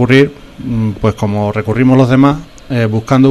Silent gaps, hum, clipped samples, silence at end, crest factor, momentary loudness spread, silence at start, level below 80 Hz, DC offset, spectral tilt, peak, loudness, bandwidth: none; none; 0.3%; 0 s; 10 dB; 11 LU; 0 s; -36 dBFS; under 0.1%; -8 dB/octave; 0 dBFS; -12 LUFS; 11.5 kHz